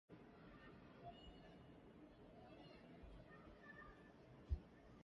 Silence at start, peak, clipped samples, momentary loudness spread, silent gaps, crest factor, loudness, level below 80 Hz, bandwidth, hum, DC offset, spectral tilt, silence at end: 0.1 s; -34 dBFS; under 0.1%; 13 LU; none; 26 dB; -60 LUFS; -62 dBFS; 7.2 kHz; none; under 0.1%; -5.5 dB/octave; 0 s